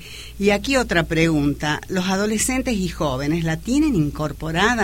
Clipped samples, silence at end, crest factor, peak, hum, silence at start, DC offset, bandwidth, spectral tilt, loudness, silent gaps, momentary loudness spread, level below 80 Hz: under 0.1%; 0 s; 16 dB; -4 dBFS; none; 0 s; 0.3%; 16.5 kHz; -4.5 dB/octave; -20 LUFS; none; 6 LU; -36 dBFS